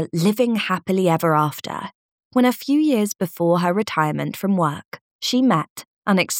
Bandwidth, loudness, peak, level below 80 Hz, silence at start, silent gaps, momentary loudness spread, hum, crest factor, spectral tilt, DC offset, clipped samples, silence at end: 18 kHz; -20 LUFS; -4 dBFS; -70 dBFS; 0 s; 1.95-2.18 s, 2.25-2.31 s, 4.85-4.92 s, 5.01-5.19 s, 5.70-5.76 s, 5.87-6.02 s; 12 LU; none; 16 dB; -5.5 dB/octave; under 0.1%; under 0.1%; 0 s